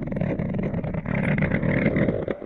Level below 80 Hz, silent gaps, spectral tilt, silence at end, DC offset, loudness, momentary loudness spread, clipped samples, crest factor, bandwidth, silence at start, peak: -40 dBFS; none; -10 dB/octave; 0 s; under 0.1%; -25 LUFS; 5 LU; under 0.1%; 16 dB; 4.4 kHz; 0 s; -8 dBFS